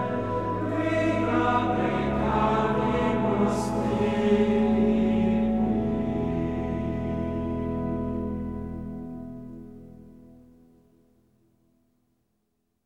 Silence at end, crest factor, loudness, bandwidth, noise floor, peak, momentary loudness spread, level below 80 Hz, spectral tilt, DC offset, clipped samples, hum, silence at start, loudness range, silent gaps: 2.35 s; 16 dB; -26 LUFS; 11 kHz; -76 dBFS; -10 dBFS; 14 LU; -42 dBFS; -7.5 dB/octave; 0.3%; under 0.1%; none; 0 s; 14 LU; none